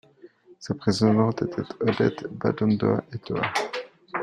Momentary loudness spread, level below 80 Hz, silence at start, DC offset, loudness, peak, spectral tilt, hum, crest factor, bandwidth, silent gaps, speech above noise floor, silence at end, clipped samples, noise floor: 12 LU; -58 dBFS; 0.25 s; under 0.1%; -25 LUFS; -6 dBFS; -6.5 dB/octave; none; 18 dB; 11 kHz; none; 28 dB; 0 s; under 0.1%; -52 dBFS